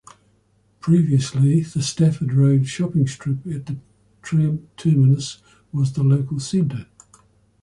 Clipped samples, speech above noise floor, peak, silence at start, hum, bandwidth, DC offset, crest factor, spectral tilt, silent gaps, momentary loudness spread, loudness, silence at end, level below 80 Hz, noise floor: under 0.1%; 42 dB; -6 dBFS; 0.85 s; none; 11 kHz; under 0.1%; 14 dB; -7 dB/octave; none; 13 LU; -20 LUFS; 0.8 s; -54 dBFS; -61 dBFS